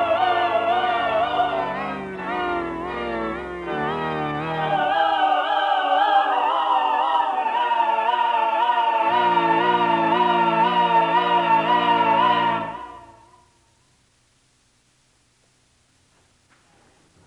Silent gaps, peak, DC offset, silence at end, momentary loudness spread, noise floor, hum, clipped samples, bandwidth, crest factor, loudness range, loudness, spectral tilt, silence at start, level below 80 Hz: none; -8 dBFS; under 0.1%; 4.15 s; 9 LU; -62 dBFS; none; under 0.1%; 9.6 kHz; 14 dB; 7 LU; -20 LUFS; -5.5 dB/octave; 0 s; -56 dBFS